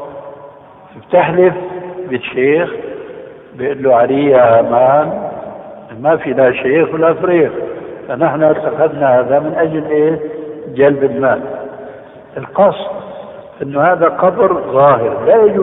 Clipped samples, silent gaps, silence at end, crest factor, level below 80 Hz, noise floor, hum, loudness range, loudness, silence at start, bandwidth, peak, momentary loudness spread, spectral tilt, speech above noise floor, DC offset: under 0.1%; none; 0 s; 14 dB; -52 dBFS; -38 dBFS; none; 4 LU; -12 LUFS; 0 s; 3.9 kHz; 0 dBFS; 19 LU; -11 dB/octave; 26 dB; under 0.1%